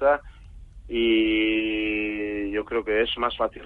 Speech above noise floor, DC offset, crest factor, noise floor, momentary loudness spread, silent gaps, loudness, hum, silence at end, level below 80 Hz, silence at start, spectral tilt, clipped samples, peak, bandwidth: 20 dB; under 0.1%; 16 dB; -44 dBFS; 7 LU; none; -24 LUFS; none; 0 s; -46 dBFS; 0 s; -6.5 dB/octave; under 0.1%; -10 dBFS; 4.1 kHz